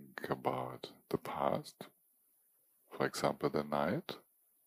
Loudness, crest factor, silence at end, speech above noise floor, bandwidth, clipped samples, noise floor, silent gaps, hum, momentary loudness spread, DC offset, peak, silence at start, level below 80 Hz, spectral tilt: -38 LUFS; 22 dB; 0.45 s; 36 dB; 15.5 kHz; under 0.1%; -73 dBFS; none; none; 16 LU; under 0.1%; -16 dBFS; 0 s; -72 dBFS; -5.5 dB/octave